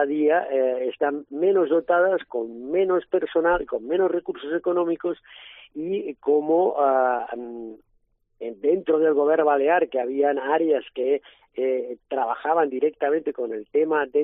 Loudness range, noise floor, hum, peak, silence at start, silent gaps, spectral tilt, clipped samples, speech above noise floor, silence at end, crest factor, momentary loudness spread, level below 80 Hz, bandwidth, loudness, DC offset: 3 LU; -66 dBFS; none; -6 dBFS; 0 s; none; -9.5 dB/octave; under 0.1%; 44 dB; 0 s; 16 dB; 11 LU; -58 dBFS; 3.9 kHz; -23 LUFS; under 0.1%